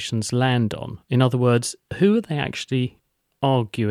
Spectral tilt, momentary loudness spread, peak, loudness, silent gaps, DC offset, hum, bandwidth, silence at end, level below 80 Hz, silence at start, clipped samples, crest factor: -6 dB/octave; 7 LU; -6 dBFS; -22 LUFS; none; under 0.1%; none; 13.5 kHz; 0 s; -56 dBFS; 0 s; under 0.1%; 16 dB